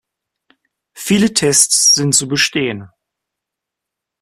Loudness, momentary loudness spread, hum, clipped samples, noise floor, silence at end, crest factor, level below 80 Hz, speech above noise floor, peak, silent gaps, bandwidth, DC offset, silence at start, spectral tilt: -12 LUFS; 13 LU; none; under 0.1%; -82 dBFS; 1.35 s; 18 dB; -54 dBFS; 68 dB; 0 dBFS; none; 16 kHz; under 0.1%; 0.95 s; -2.5 dB/octave